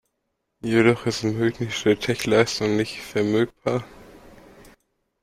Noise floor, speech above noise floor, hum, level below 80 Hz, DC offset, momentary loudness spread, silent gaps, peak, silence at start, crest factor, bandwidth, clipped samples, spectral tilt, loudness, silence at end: -77 dBFS; 55 dB; none; -54 dBFS; under 0.1%; 8 LU; none; -4 dBFS; 0.65 s; 20 dB; 15.5 kHz; under 0.1%; -5.5 dB/octave; -22 LUFS; 1.05 s